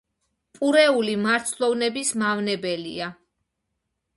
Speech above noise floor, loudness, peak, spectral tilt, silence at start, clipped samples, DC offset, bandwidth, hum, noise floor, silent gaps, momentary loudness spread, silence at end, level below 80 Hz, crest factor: 56 dB; -22 LUFS; -4 dBFS; -3 dB/octave; 0.6 s; under 0.1%; under 0.1%; 12 kHz; none; -79 dBFS; none; 12 LU; 1.05 s; -68 dBFS; 20 dB